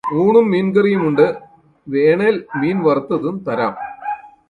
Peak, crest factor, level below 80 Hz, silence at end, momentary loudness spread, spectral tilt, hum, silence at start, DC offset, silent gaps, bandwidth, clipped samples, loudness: 0 dBFS; 16 dB; -58 dBFS; 0.2 s; 13 LU; -9 dB/octave; none; 0.05 s; under 0.1%; none; 4.6 kHz; under 0.1%; -16 LUFS